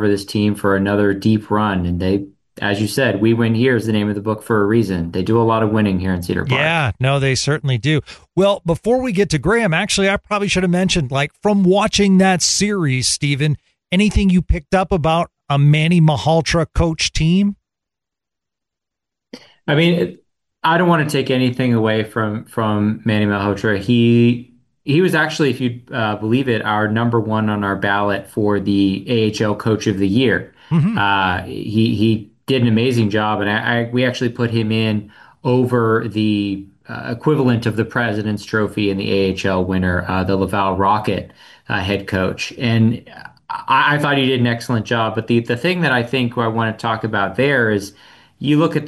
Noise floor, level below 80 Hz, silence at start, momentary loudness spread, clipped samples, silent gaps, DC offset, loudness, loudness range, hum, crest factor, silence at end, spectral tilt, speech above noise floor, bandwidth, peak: -84 dBFS; -38 dBFS; 0 s; 7 LU; under 0.1%; none; under 0.1%; -17 LUFS; 3 LU; none; 14 dB; 0 s; -5.5 dB/octave; 68 dB; 12.5 kHz; -4 dBFS